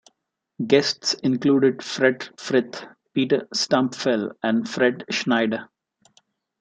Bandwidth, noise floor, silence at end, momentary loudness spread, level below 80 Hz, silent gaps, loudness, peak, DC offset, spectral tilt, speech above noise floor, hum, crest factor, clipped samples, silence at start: 9 kHz; -76 dBFS; 0.95 s; 9 LU; -70 dBFS; none; -22 LUFS; -2 dBFS; under 0.1%; -4.5 dB/octave; 55 dB; none; 20 dB; under 0.1%; 0.6 s